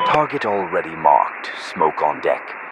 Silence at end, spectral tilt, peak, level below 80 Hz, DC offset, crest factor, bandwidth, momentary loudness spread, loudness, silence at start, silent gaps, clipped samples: 0 s; -5 dB/octave; 0 dBFS; -60 dBFS; under 0.1%; 20 dB; 10 kHz; 9 LU; -19 LUFS; 0 s; none; under 0.1%